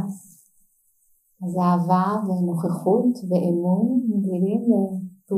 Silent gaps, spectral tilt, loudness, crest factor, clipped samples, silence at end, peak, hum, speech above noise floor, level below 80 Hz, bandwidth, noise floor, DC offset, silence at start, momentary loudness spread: none; -9.5 dB/octave; -22 LUFS; 16 dB; under 0.1%; 0 s; -6 dBFS; none; 42 dB; -76 dBFS; 13 kHz; -63 dBFS; under 0.1%; 0 s; 9 LU